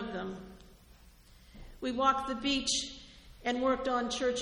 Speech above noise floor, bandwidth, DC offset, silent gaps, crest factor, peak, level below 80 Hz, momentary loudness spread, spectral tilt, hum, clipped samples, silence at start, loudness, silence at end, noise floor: 27 dB; 14.5 kHz; under 0.1%; none; 20 dB; -14 dBFS; -54 dBFS; 18 LU; -2.5 dB/octave; none; under 0.1%; 0 s; -32 LUFS; 0 s; -58 dBFS